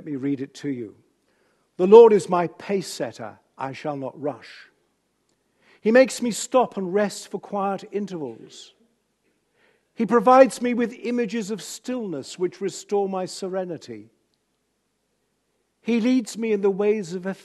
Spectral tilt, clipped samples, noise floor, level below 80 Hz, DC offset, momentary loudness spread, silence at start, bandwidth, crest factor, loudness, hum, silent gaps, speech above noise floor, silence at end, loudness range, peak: -5.5 dB/octave; under 0.1%; -73 dBFS; -76 dBFS; under 0.1%; 18 LU; 0 s; 12.5 kHz; 22 dB; -22 LUFS; none; none; 51 dB; 0.1 s; 11 LU; 0 dBFS